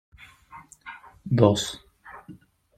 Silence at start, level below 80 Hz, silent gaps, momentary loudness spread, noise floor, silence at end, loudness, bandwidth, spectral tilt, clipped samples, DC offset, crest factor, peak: 0.55 s; -58 dBFS; none; 26 LU; -50 dBFS; 0.45 s; -23 LUFS; 14 kHz; -6 dB/octave; under 0.1%; under 0.1%; 26 dB; -2 dBFS